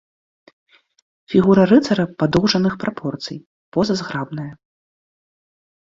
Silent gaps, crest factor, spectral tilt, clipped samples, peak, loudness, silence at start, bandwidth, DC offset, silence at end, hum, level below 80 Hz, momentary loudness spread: 3.46-3.72 s; 18 dB; -6.5 dB/octave; under 0.1%; -2 dBFS; -18 LUFS; 1.3 s; 7.6 kHz; under 0.1%; 1.3 s; none; -50 dBFS; 17 LU